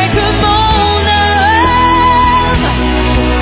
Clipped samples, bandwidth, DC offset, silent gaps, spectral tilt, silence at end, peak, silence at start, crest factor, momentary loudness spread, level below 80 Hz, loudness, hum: under 0.1%; 4 kHz; under 0.1%; none; -9.5 dB/octave; 0 s; 0 dBFS; 0 s; 10 dB; 4 LU; -18 dBFS; -10 LUFS; none